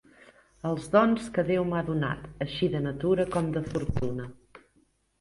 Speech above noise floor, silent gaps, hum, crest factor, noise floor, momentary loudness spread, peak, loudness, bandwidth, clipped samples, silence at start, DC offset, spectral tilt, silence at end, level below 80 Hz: 40 dB; none; none; 20 dB; -68 dBFS; 11 LU; -8 dBFS; -28 LUFS; 11.5 kHz; under 0.1%; 0.65 s; under 0.1%; -7 dB/octave; 0.65 s; -48 dBFS